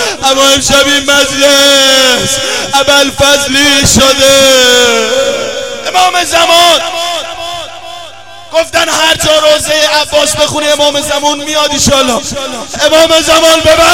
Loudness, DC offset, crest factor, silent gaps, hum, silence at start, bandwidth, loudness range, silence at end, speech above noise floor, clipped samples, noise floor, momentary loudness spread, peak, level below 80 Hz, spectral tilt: -6 LUFS; 2%; 8 dB; none; none; 0 s; 18 kHz; 4 LU; 0 s; 22 dB; 0.4%; -30 dBFS; 12 LU; 0 dBFS; -34 dBFS; -1.5 dB/octave